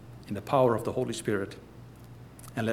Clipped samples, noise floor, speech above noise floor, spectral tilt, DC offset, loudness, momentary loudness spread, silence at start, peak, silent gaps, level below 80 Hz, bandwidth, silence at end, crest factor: under 0.1%; -48 dBFS; 20 dB; -6 dB/octave; under 0.1%; -30 LUFS; 24 LU; 0 s; -12 dBFS; none; -60 dBFS; 16.5 kHz; 0 s; 20 dB